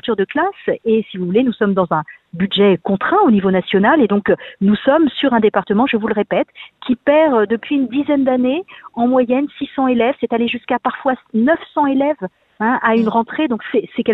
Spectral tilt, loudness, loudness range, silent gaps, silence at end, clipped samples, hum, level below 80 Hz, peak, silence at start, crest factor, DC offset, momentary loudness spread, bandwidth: -9.5 dB/octave; -16 LUFS; 3 LU; none; 0 s; under 0.1%; none; -54 dBFS; 0 dBFS; 0.05 s; 14 dB; under 0.1%; 7 LU; 4.2 kHz